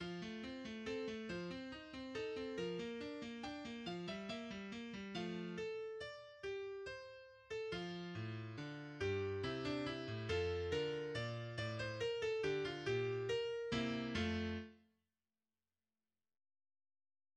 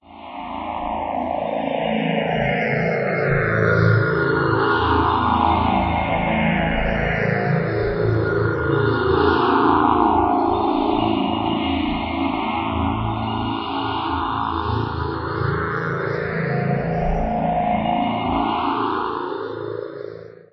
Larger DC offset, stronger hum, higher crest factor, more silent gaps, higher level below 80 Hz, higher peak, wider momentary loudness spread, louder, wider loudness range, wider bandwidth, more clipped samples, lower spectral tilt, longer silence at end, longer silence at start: neither; neither; about the same, 18 dB vs 18 dB; neither; second, -66 dBFS vs -36 dBFS; second, -28 dBFS vs -2 dBFS; about the same, 9 LU vs 8 LU; second, -44 LUFS vs -20 LUFS; about the same, 6 LU vs 5 LU; first, 9.8 kHz vs 6 kHz; neither; second, -5.5 dB/octave vs -9 dB/octave; first, 2.55 s vs 0.2 s; about the same, 0 s vs 0.1 s